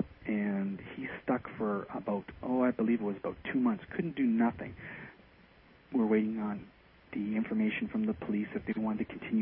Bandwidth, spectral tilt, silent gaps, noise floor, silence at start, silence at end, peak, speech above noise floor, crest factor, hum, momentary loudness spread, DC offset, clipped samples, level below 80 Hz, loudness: 3.7 kHz; -10.5 dB/octave; none; -60 dBFS; 0 s; 0 s; -18 dBFS; 28 dB; 16 dB; none; 12 LU; under 0.1%; under 0.1%; -62 dBFS; -34 LUFS